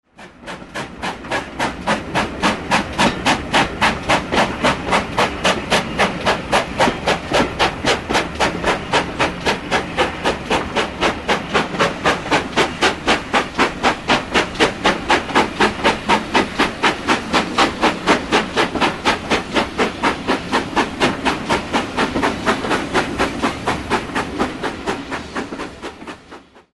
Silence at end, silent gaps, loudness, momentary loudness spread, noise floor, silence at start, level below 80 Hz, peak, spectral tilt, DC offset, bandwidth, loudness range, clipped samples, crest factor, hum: 0.15 s; none; -18 LUFS; 8 LU; -41 dBFS; 0.2 s; -38 dBFS; -2 dBFS; -3.5 dB/octave; under 0.1%; 11.5 kHz; 3 LU; under 0.1%; 18 dB; none